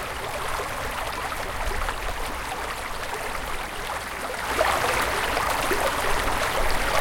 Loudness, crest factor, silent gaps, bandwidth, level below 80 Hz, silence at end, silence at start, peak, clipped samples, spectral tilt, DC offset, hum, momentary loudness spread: -26 LUFS; 18 dB; none; 17 kHz; -36 dBFS; 0 s; 0 s; -8 dBFS; under 0.1%; -2.5 dB/octave; under 0.1%; none; 7 LU